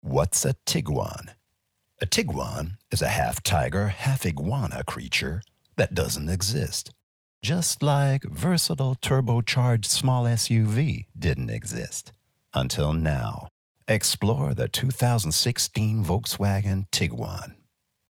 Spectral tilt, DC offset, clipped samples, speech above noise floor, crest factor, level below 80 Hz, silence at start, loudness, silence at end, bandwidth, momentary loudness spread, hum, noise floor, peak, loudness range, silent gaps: -4.5 dB/octave; under 0.1%; under 0.1%; 51 dB; 18 dB; -42 dBFS; 0.05 s; -25 LUFS; 0.55 s; 18 kHz; 11 LU; none; -75 dBFS; -8 dBFS; 4 LU; 7.03-7.41 s, 13.51-13.75 s